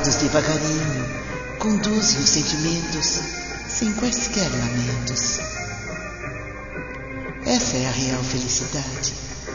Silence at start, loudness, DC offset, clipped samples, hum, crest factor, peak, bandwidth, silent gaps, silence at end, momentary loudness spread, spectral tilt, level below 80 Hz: 0 s; -22 LUFS; under 0.1%; under 0.1%; none; 20 dB; -2 dBFS; 7.4 kHz; none; 0 s; 13 LU; -3 dB/octave; -38 dBFS